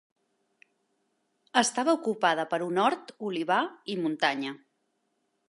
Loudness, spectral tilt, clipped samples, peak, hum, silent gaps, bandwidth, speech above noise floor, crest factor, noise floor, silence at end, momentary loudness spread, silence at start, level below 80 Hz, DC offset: -28 LUFS; -3 dB/octave; under 0.1%; -8 dBFS; none; none; 11.5 kHz; 49 dB; 22 dB; -76 dBFS; 0.95 s; 9 LU; 1.55 s; -86 dBFS; under 0.1%